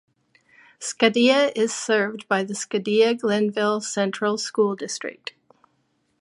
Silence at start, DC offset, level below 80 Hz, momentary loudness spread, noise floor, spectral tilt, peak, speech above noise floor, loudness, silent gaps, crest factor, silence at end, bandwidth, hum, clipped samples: 0.8 s; under 0.1%; -74 dBFS; 13 LU; -69 dBFS; -3.5 dB/octave; -2 dBFS; 47 dB; -22 LUFS; none; 20 dB; 1.05 s; 11.5 kHz; none; under 0.1%